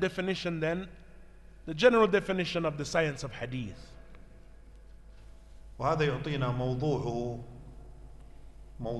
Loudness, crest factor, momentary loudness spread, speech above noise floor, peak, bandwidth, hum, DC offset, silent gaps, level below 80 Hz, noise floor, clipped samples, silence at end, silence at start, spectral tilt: -30 LUFS; 22 dB; 22 LU; 21 dB; -10 dBFS; 12 kHz; none; under 0.1%; none; -50 dBFS; -51 dBFS; under 0.1%; 0 s; 0 s; -6 dB/octave